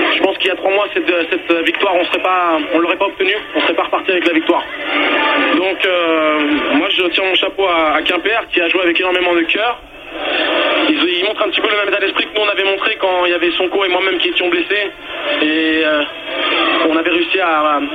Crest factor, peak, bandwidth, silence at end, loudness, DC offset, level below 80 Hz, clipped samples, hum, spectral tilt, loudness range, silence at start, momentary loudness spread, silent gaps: 14 dB; 0 dBFS; 10 kHz; 0 s; -14 LUFS; under 0.1%; -52 dBFS; under 0.1%; none; -4 dB/octave; 1 LU; 0 s; 3 LU; none